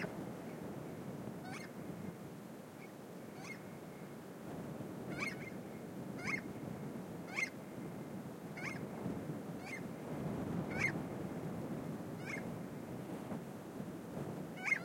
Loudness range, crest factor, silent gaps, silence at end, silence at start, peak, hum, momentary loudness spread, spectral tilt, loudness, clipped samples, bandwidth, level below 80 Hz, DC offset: 7 LU; 22 dB; none; 0 s; 0 s; -24 dBFS; none; 10 LU; -6 dB/octave; -45 LUFS; under 0.1%; 16.5 kHz; -72 dBFS; under 0.1%